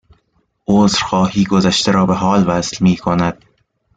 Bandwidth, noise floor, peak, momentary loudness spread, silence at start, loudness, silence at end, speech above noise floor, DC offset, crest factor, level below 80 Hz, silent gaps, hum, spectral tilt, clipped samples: 9.2 kHz; -62 dBFS; -2 dBFS; 4 LU; 0.7 s; -14 LUFS; 0.65 s; 49 dB; under 0.1%; 14 dB; -44 dBFS; none; none; -5.5 dB/octave; under 0.1%